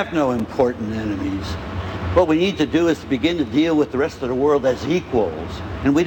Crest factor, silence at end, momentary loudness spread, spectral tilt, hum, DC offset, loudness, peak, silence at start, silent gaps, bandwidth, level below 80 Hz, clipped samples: 18 dB; 0 s; 9 LU; -6.5 dB/octave; none; under 0.1%; -20 LUFS; -2 dBFS; 0 s; none; 17 kHz; -40 dBFS; under 0.1%